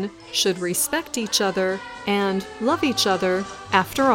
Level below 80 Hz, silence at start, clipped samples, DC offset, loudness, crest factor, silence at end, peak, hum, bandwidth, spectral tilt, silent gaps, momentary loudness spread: -56 dBFS; 0 s; under 0.1%; under 0.1%; -22 LUFS; 20 dB; 0 s; -2 dBFS; none; 17 kHz; -3 dB/octave; none; 5 LU